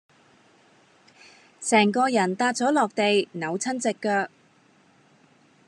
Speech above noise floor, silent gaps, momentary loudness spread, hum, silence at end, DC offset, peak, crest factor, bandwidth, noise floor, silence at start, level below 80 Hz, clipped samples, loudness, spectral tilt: 36 dB; none; 8 LU; none; 1.4 s; under 0.1%; -6 dBFS; 20 dB; 11.5 kHz; -59 dBFS; 1.6 s; -86 dBFS; under 0.1%; -23 LUFS; -4 dB/octave